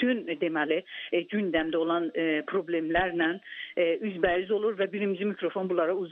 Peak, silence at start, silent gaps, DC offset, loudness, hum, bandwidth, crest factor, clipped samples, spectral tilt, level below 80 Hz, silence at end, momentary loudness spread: -10 dBFS; 0 s; none; under 0.1%; -29 LUFS; none; 4.1 kHz; 18 dB; under 0.1%; -8.5 dB/octave; -58 dBFS; 0 s; 4 LU